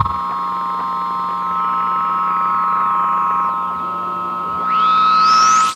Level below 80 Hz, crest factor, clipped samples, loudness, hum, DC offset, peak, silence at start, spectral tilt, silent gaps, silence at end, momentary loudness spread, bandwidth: -48 dBFS; 16 dB; under 0.1%; -16 LUFS; none; under 0.1%; 0 dBFS; 0 s; -2.5 dB/octave; none; 0 s; 10 LU; 13 kHz